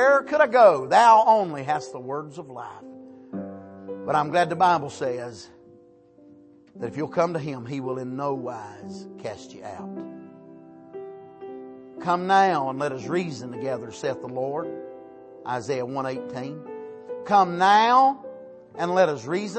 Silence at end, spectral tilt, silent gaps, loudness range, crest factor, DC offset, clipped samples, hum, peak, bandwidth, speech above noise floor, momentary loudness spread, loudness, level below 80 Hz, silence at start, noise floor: 0 s; -5.5 dB/octave; none; 12 LU; 20 dB; under 0.1%; under 0.1%; none; -4 dBFS; 8.8 kHz; 30 dB; 24 LU; -22 LUFS; -72 dBFS; 0 s; -53 dBFS